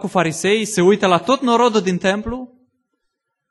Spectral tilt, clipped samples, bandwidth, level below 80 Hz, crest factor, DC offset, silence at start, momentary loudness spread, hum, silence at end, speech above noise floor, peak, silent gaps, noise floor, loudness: -4.5 dB/octave; under 0.1%; 12 kHz; -46 dBFS; 18 dB; under 0.1%; 0 s; 8 LU; none; 1.05 s; 58 dB; 0 dBFS; none; -75 dBFS; -16 LUFS